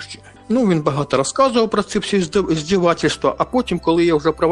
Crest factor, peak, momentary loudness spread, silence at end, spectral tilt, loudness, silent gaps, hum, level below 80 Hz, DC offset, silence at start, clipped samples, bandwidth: 16 dB; -2 dBFS; 4 LU; 0 s; -5.5 dB/octave; -18 LUFS; none; none; -44 dBFS; under 0.1%; 0 s; under 0.1%; 11 kHz